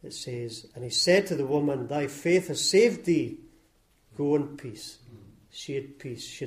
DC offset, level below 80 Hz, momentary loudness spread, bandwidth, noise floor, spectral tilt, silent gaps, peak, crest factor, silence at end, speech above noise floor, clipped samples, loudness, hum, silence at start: under 0.1%; -64 dBFS; 19 LU; 15.5 kHz; -64 dBFS; -4 dB/octave; none; -10 dBFS; 18 dB; 0 s; 37 dB; under 0.1%; -26 LUFS; none; 0.05 s